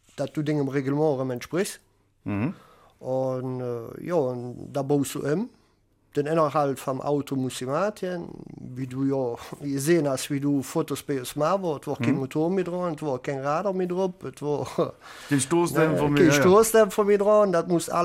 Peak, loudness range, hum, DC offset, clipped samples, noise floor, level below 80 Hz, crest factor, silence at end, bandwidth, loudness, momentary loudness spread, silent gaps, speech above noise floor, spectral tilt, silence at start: -6 dBFS; 7 LU; none; under 0.1%; under 0.1%; -64 dBFS; -60 dBFS; 20 dB; 0 s; 16 kHz; -25 LUFS; 13 LU; none; 40 dB; -5.5 dB/octave; 0.15 s